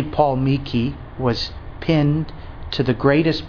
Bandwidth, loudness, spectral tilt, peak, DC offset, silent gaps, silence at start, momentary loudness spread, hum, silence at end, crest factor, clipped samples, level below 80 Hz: 5.4 kHz; -20 LUFS; -8 dB/octave; -2 dBFS; under 0.1%; none; 0 s; 12 LU; none; 0 s; 18 dB; under 0.1%; -36 dBFS